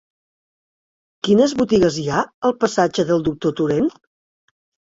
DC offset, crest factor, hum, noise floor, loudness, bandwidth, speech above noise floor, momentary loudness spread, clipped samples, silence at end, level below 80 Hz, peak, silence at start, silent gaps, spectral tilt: under 0.1%; 18 dB; none; under -90 dBFS; -18 LUFS; 8 kHz; over 72 dB; 6 LU; under 0.1%; 1 s; -50 dBFS; -2 dBFS; 1.25 s; 2.34-2.42 s; -5.5 dB/octave